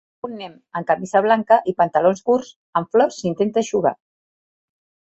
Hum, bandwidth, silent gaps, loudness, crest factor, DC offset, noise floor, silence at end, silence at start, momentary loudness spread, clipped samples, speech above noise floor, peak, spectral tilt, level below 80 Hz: none; 8.2 kHz; 2.56-2.73 s; -19 LUFS; 18 dB; under 0.1%; under -90 dBFS; 1.2 s; 0.25 s; 14 LU; under 0.1%; over 71 dB; -2 dBFS; -5.5 dB/octave; -64 dBFS